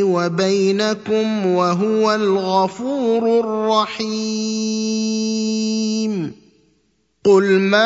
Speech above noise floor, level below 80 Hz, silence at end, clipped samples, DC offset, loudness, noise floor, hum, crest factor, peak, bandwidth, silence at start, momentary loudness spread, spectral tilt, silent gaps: 46 dB; -64 dBFS; 0 s; under 0.1%; under 0.1%; -18 LUFS; -64 dBFS; none; 18 dB; 0 dBFS; 8 kHz; 0 s; 6 LU; -5 dB/octave; none